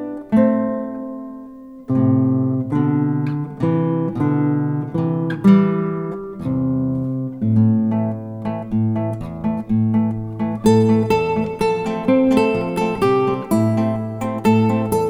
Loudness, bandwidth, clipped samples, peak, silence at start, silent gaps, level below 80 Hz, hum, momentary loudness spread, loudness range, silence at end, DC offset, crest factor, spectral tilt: -19 LUFS; 14 kHz; under 0.1%; -2 dBFS; 0 s; none; -46 dBFS; none; 10 LU; 3 LU; 0 s; under 0.1%; 16 dB; -8.5 dB/octave